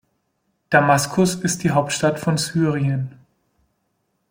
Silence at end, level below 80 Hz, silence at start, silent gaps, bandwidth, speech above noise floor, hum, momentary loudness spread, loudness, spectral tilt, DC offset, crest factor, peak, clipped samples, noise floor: 1.2 s; -56 dBFS; 0.7 s; none; 16.5 kHz; 52 dB; none; 6 LU; -19 LUFS; -5 dB/octave; under 0.1%; 20 dB; -2 dBFS; under 0.1%; -71 dBFS